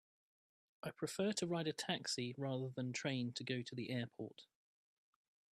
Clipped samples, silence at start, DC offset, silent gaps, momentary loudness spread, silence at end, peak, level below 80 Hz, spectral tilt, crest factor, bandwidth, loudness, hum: under 0.1%; 0.85 s; under 0.1%; none; 12 LU; 1.1 s; -24 dBFS; -84 dBFS; -4.5 dB/octave; 20 dB; 14 kHz; -43 LUFS; none